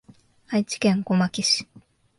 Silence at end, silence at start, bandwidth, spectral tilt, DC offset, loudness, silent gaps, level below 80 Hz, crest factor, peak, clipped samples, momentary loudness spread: 0.55 s; 0.5 s; 11.5 kHz; -4.5 dB/octave; under 0.1%; -23 LUFS; none; -62 dBFS; 16 dB; -8 dBFS; under 0.1%; 6 LU